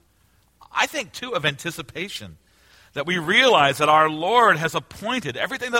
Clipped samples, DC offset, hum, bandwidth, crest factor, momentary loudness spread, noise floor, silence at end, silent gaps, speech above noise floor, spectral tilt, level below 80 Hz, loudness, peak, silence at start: under 0.1%; under 0.1%; none; 16.5 kHz; 20 dB; 15 LU; -61 dBFS; 0 s; none; 39 dB; -3.5 dB/octave; -58 dBFS; -20 LUFS; -2 dBFS; 0.75 s